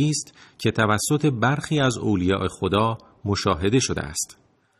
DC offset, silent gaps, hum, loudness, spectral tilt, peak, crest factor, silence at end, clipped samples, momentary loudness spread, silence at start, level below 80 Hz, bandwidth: under 0.1%; none; none; -23 LUFS; -5 dB/octave; -6 dBFS; 18 dB; 0.5 s; under 0.1%; 8 LU; 0 s; -48 dBFS; 13.5 kHz